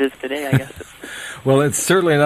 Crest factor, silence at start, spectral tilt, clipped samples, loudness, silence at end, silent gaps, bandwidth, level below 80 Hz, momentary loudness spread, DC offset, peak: 18 dB; 0 s; -5 dB/octave; under 0.1%; -18 LUFS; 0 s; none; 14 kHz; -52 dBFS; 17 LU; under 0.1%; -2 dBFS